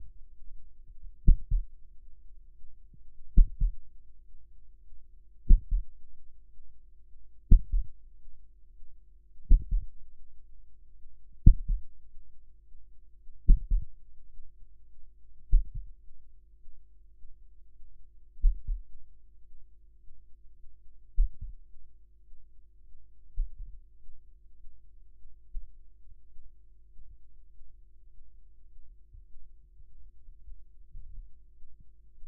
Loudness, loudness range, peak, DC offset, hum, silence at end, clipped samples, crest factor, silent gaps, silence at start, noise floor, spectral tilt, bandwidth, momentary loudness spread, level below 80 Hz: -32 LUFS; 24 LU; -2 dBFS; under 0.1%; none; 0 s; under 0.1%; 28 dB; none; 0 s; -48 dBFS; -17.5 dB/octave; 0.5 kHz; 29 LU; -30 dBFS